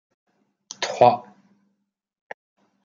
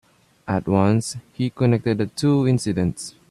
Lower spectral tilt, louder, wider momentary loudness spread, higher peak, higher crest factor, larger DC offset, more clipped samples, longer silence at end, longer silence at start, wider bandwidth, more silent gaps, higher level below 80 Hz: second, -4 dB/octave vs -6.5 dB/octave; about the same, -20 LUFS vs -21 LUFS; first, 25 LU vs 10 LU; about the same, -2 dBFS vs -4 dBFS; first, 24 dB vs 18 dB; neither; neither; first, 1.65 s vs 0.2 s; first, 0.8 s vs 0.45 s; second, 7.6 kHz vs 12.5 kHz; neither; second, -72 dBFS vs -52 dBFS